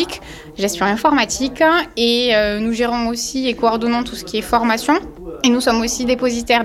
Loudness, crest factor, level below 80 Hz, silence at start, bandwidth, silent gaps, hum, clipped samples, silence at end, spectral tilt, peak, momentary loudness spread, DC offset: -17 LUFS; 12 dB; -40 dBFS; 0 s; 15.5 kHz; none; none; under 0.1%; 0 s; -3 dB/octave; -4 dBFS; 8 LU; under 0.1%